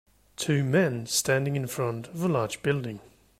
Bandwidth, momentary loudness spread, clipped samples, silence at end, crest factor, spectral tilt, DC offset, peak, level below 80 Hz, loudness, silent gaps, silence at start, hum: 16 kHz; 10 LU; under 0.1%; 0.35 s; 16 dB; -4.5 dB/octave; under 0.1%; -12 dBFS; -62 dBFS; -27 LUFS; none; 0.4 s; none